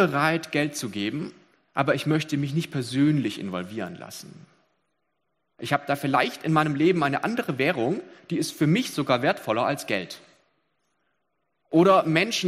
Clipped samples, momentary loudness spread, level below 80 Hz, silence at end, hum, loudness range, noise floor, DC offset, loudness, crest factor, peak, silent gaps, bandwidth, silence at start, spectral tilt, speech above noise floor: under 0.1%; 13 LU; -68 dBFS; 0 s; none; 5 LU; -77 dBFS; under 0.1%; -25 LUFS; 22 dB; -4 dBFS; none; 15.5 kHz; 0 s; -5.5 dB/octave; 53 dB